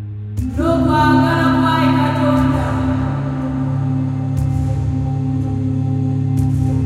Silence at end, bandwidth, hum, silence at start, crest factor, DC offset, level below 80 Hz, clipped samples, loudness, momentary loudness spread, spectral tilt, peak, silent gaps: 0 s; 13 kHz; none; 0 s; 14 dB; under 0.1%; -32 dBFS; under 0.1%; -17 LUFS; 7 LU; -8 dB/octave; -2 dBFS; none